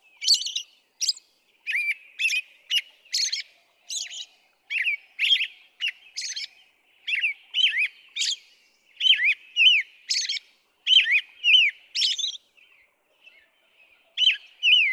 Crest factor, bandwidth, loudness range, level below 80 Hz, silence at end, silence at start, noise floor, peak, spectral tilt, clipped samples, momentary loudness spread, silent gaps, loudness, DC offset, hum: 18 dB; 15 kHz; 8 LU; under -90 dBFS; 0 s; 0.2 s; -62 dBFS; -8 dBFS; 8 dB/octave; under 0.1%; 16 LU; none; -22 LUFS; under 0.1%; none